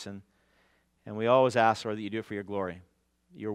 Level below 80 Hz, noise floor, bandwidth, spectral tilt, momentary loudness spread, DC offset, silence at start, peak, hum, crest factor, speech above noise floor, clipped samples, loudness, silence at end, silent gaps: -74 dBFS; -69 dBFS; 12.5 kHz; -5.5 dB/octave; 20 LU; under 0.1%; 0 s; -10 dBFS; none; 22 dB; 40 dB; under 0.1%; -28 LUFS; 0 s; none